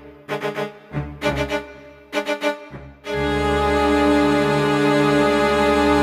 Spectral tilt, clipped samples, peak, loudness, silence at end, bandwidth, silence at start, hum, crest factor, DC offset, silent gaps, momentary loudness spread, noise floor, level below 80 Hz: -5.5 dB/octave; under 0.1%; -6 dBFS; -19 LUFS; 0 s; 15.5 kHz; 0 s; none; 14 dB; under 0.1%; none; 14 LU; -41 dBFS; -36 dBFS